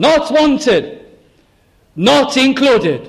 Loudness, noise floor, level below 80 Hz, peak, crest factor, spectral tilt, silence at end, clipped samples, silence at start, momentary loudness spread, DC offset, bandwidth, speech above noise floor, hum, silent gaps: -12 LUFS; -53 dBFS; -46 dBFS; -2 dBFS; 12 dB; -4.5 dB/octave; 0 s; under 0.1%; 0 s; 7 LU; under 0.1%; 13.5 kHz; 41 dB; none; none